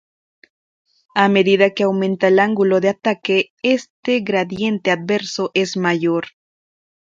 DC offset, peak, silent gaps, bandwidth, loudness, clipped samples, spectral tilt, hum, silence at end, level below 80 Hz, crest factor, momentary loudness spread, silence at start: under 0.1%; 0 dBFS; 3.50-3.57 s, 3.90-4.03 s; 7.6 kHz; -17 LUFS; under 0.1%; -5.5 dB/octave; none; 0.75 s; -64 dBFS; 18 dB; 6 LU; 1.15 s